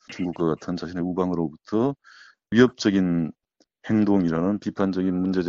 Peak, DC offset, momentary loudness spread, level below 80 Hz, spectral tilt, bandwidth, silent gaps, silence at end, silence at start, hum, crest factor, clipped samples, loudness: -4 dBFS; under 0.1%; 10 LU; -56 dBFS; -6.5 dB/octave; 7.4 kHz; none; 0 s; 0.1 s; none; 20 dB; under 0.1%; -24 LUFS